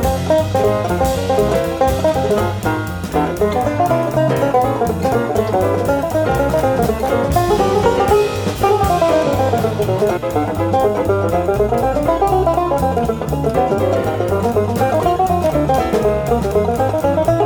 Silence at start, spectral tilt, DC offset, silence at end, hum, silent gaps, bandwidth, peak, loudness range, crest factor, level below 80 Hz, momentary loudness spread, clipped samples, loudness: 0 s; -6.5 dB/octave; under 0.1%; 0 s; none; none; over 20 kHz; -2 dBFS; 2 LU; 14 dB; -32 dBFS; 3 LU; under 0.1%; -16 LUFS